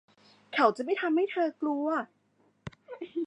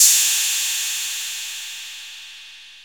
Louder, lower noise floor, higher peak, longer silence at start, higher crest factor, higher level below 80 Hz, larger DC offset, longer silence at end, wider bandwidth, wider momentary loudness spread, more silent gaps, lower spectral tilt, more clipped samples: second, -29 LUFS vs -19 LUFS; first, -48 dBFS vs -42 dBFS; second, -10 dBFS vs 0 dBFS; first, 0.5 s vs 0 s; about the same, 22 dB vs 22 dB; about the same, -70 dBFS vs -74 dBFS; second, under 0.1% vs 0.1%; about the same, 0 s vs 0 s; second, 9.6 kHz vs over 20 kHz; about the same, 21 LU vs 22 LU; neither; first, -6 dB/octave vs 7.5 dB/octave; neither